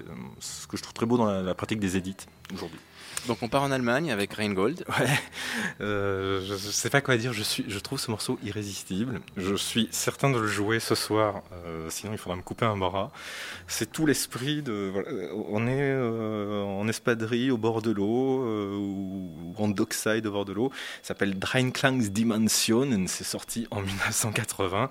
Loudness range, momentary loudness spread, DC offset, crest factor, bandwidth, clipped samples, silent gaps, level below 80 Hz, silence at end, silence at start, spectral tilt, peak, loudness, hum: 4 LU; 11 LU; under 0.1%; 24 dB; 16.5 kHz; under 0.1%; none; -58 dBFS; 0 s; 0 s; -4.5 dB/octave; -4 dBFS; -28 LUFS; none